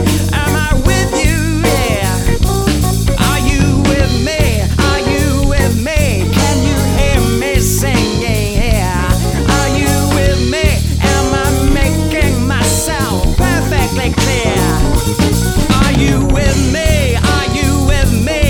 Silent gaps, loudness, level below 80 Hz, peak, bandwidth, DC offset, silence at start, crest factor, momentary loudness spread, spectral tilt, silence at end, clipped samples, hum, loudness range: none; -13 LUFS; -16 dBFS; 0 dBFS; 19.5 kHz; under 0.1%; 0 s; 12 dB; 2 LU; -5 dB/octave; 0 s; under 0.1%; none; 1 LU